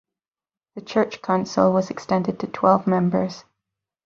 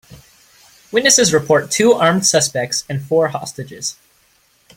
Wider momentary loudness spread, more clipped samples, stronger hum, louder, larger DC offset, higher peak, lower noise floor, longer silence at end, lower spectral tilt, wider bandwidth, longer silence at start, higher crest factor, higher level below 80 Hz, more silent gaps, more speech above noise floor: about the same, 12 LU vs 14 LU; neither; neither; second, -22 LUFS vs -15 LUFS; neither; about the same, -2 dBFS vs 0 dBFS; first, under -90 dBFS vs -57 dBFS; second, 0.65 s vs 0.85 s; first, -7 dB/octave vs -3 dB/octave; second, 7.2 kHz vs 16.5 kHz; first, 0.75 s vs 0.1 s; about the same, 20 dB vs 18 dB; second, -62 dBFS vs -56 dBFS; neither; first, over 69 dB vs 41 dB